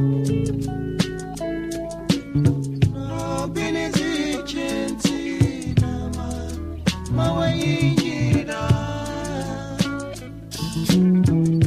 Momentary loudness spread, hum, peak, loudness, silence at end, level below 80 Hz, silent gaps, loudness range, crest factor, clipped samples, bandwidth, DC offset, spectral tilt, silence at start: 10 LU; none; -4 dBFS; -23 LUFS; 0 s; -38 dBFS; none; 2 LU; 18 dB; under 0.1%; 15.5 kHz; under 0.1%; -6 dB/octave; 0 s